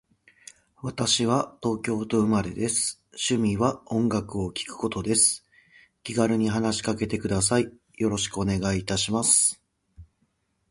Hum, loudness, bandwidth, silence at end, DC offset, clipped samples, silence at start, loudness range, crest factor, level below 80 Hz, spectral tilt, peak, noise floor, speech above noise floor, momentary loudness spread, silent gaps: none; -25 LUFS; 11.5 kHz; 0.7 s; under 0.1%; under 0.1%; 0.85 s; 2 LU; 20 dB; -50 dBFS; -3.5 dB/octave; -6 dBFS; -72 dBFS; 47 dB; 11 LU; none